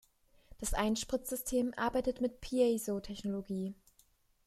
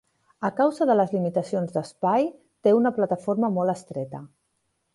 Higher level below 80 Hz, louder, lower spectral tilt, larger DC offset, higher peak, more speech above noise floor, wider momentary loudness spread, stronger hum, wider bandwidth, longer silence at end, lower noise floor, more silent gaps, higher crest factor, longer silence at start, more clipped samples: first, -50 dBFS vs -70 dBFS; second, -35 LUFS vs -24 LUFS; second, -4.5 dB/octave vs -7.5 dB/octave; neither; second, -18 dBFS vs -8 dBFS; second, 35 dB vs 51 dB; about the same, 9 LU vs 11 LU; neither; first, 15 kHz vs 11.5 kHz; about the same, 0.75 s vs 0.7 s; second, -70 dBFS vs -74 dBFS; neither; about the same, 18 dB vs 16 dB; about the same, 0.5 s vs 0.4 s; neither